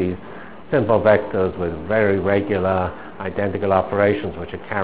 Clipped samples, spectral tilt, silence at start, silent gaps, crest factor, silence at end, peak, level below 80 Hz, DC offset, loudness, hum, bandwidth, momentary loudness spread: under 0.1%; -11 dB/octave; 0 s; none; 20 dB; 0 s; 0 dBFS; -42 dBFS; 1%; -20 LUFS; none; 4 kHz; 13 LU